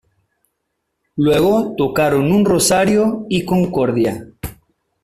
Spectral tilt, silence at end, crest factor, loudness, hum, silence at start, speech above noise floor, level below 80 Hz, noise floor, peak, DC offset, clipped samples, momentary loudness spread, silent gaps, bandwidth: -5 dB/octave; 0.5 s; 14 dB; -15 LUFS; none; 1.15 s; 58 dB; -46 dBFS; -73 dBFS; -2 dBFS; under 0.1%; under 0.1%; 16 LU; none; 15.5 kHz